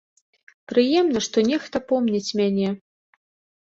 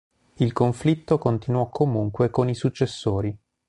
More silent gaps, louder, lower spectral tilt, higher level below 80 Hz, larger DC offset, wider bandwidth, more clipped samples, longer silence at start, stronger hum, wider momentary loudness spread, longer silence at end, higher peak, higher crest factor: neither; about the same, -22 LUFS vs -24 LUFS; second, -5 dB/octave vs -8 dB/octave; second, -62 dBFS vs -48 dBFS; neither; second, 8 kHz vs 11 kHz; neither; first, 0.7 s vs 0.4 s; neither; first, 7 LU vs 4 LU; first, 0.85 s vs 0.3 s; about the same, -6 dBFS vs -6 dBFS; about the same, 16 dB vs 18 dB